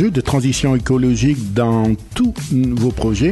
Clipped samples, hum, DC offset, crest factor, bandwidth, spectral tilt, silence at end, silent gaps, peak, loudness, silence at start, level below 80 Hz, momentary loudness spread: under 0.1%; none; under 0.1%; 10 dB; 12.5 kHz; -6.5 dB/octave; 0 s; none; -4 dBFS; -17 LUFS; 0 s; -32 dBFS; 3 LU